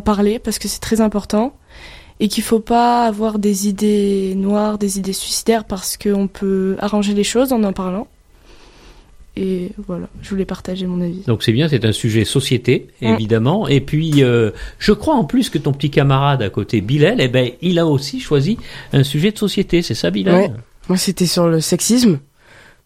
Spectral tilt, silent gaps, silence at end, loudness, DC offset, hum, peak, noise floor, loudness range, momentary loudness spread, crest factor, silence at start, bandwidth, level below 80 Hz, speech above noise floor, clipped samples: -5.5 dB/octave; none; 0.65 s; -17 LUFS; under 0.1%; none; 0 dBFS; -46 dBFS; 5 LU; 9 LU; 16 dB; 0 s; 16 kHz; -40 dBFS; 30 dB; under 0.1%